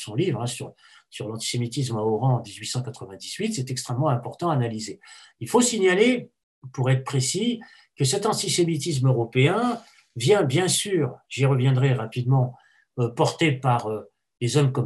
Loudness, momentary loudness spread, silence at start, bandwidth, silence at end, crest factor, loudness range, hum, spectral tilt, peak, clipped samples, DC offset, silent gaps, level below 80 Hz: -24 LUFS; 14 LU; 0 s; 12.5 kHz; 0 s; 18 dB; 5 LU; none; -5 dB/octave; -6 dBFS; under 0.1%; under 0.1%; 6.43-6.62 s; -66 dBFS